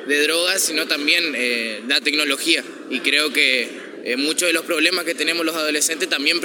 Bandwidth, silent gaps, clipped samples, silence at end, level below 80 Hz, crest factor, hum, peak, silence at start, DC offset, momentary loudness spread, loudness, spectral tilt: 17.5 kHz; none; under 0.1%; 0 s; -86 dBFS; 20 dB; none; 0 dBFS; 0 s; under 0.1%; 6 LU; -18 LUFS; 0 dB/octave